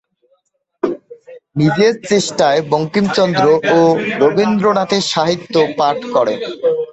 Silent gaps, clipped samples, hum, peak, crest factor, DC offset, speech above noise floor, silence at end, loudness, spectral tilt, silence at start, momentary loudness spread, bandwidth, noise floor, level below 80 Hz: none; under 0.1%; none; 0 dBFS; 14 dB; under 0.1%; 50 dB; 0 s; -14 LUFS; -5 dB/octave; 0.85 s; 7 LU; 8.2 kHz; -63 dBFS; -54 dBFS